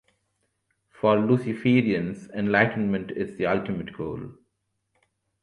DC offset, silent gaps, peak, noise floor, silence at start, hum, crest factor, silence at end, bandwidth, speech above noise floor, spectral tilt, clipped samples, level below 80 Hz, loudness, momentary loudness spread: under 0.1%; none; -4 dBFS; -77 dBFS; 1.05 s; none; 22 dB; 1.1 s; 10 kHz; 53 dB; -8 dB/octave; under 0.1%; -58 dBFS; -25 LUFS; 12 LU